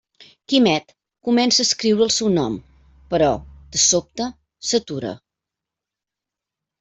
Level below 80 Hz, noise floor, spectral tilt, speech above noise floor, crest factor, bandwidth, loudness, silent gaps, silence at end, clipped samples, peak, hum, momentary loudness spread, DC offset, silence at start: -50 dBFS; -86 dBFS; -3 dB/octave; 67 dB; 18 dB; 8.4 kHz; -19 LUFS; none; 1.65 s; under 0.1%; -4 dBFS; none; 13 LU; under 0.1%; 0.5 s